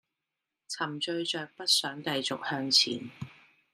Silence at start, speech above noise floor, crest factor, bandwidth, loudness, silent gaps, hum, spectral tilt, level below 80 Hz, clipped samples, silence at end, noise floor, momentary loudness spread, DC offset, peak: 0.7 s; 56 dB; 22 dB; 15.5 kHz; -28 LUFS; none; none; -2 dB/octave; -78 dBFS; under 0.1%; 0.4 s; -87 dBFS; 18 LU; under 0.1%; -10 dBFS